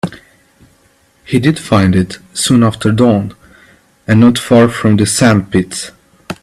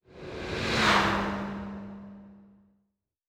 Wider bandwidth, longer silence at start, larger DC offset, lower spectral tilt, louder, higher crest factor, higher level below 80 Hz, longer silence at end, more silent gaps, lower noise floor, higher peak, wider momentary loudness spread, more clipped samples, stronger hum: second, 13.5 kHz vs 17.5 kHz; about the same, 0.05 s vs 0.1 s; neither; first, -5.5 dB/octave vs -4 dB/octave; first, -11 LUFS vs -27 LUFS; second, 12 dB vs 22 dB; first, -44 dBFS vs -50 dBFS; second, 0.1 s vs 0.9 s; neither; second, -52 dBFS vs -78 dBFS; first, 0 dBFS vs -10 dBFS; second, 15 LU vs 21 LU; neither; neither